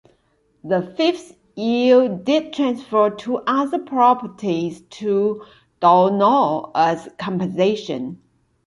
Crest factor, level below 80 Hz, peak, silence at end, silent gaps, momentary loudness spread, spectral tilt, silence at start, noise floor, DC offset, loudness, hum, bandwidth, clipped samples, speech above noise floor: 16 dB; -64 dBFS; -2 dBFS; 0.5 s; none; 13 LU; -6.5 dB/octave; 0.65 s; -63 dBFS; under 0.1%; -19 LUFS; none; 11.5 kHz; under 0.1%; 44 dB